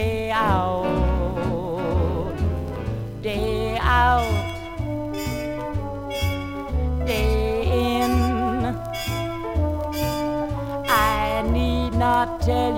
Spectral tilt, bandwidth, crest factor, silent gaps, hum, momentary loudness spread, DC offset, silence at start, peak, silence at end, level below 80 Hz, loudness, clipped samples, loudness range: -6 dB/octave; 17 kHz; 18 dB; none; none; 9 LU; under 0.1%; 0 s; -6 dBFS; 0 s; -30 dBFS; -23 LUFS; under 0.1%; 2 LU